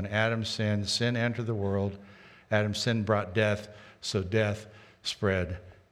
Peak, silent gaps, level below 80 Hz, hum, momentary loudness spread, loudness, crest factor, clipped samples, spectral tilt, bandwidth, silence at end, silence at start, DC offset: -10 dBFS; none; -58 dBFS; none; 10 LU; -30 LUFS; 20 dB; under 0.1%; -5 dB/octave; 12.5 kHz; 0.2 s; 0 s; under 0.1%